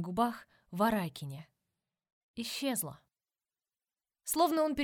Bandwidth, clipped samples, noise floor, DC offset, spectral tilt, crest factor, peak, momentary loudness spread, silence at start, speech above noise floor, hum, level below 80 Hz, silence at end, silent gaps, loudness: 19 kHz; under 0.1%; under -90 dBFS; under 0.1%; -4 dB/octave; 20 dB; -16 dBFS; 17 LU; 0 s; over 57 dB; none; -66 dBFS; 0 s; 2.12-2.34 s; -33 LUFS